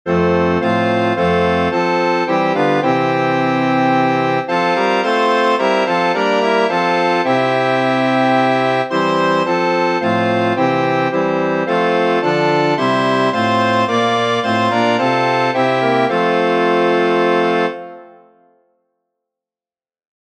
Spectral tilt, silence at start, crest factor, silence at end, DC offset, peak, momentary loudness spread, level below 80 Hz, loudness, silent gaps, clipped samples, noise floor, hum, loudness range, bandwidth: -6 dB/octave; 0.05 s; 14 dB; 2.25 s; under 0.1%; -2 dBFS; 2 LU; -52 dBFS; -15 LUFS; none; under 0.1%; under -90 dBFS; none; 1 LU; 10 kHz